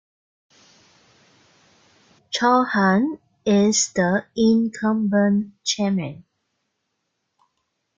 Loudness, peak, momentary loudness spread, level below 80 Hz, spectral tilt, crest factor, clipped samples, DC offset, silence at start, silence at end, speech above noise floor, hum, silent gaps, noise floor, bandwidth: -20 LUFS; -4 dBFS; 9 LU; -62 dBFS; -4.5 dB/octave; 18 dB; under 0.1%; under 0.1%; 2.3 s; 1.8 s; 56 dB; none; none; -76 dBFS; 9.4 kHz